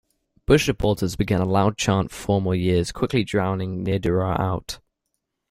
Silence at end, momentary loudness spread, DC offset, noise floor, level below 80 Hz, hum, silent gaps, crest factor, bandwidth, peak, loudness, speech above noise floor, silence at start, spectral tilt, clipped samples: 0.75 s; 7 LU; under 0.1%; -78 dBFS; -42 dBFS; none; none; 20 dB; 15.5 kHz; -2 dBFS; -22 LUFS; 57 dB; 0.5 s; -6 dB/octave; under 0.1%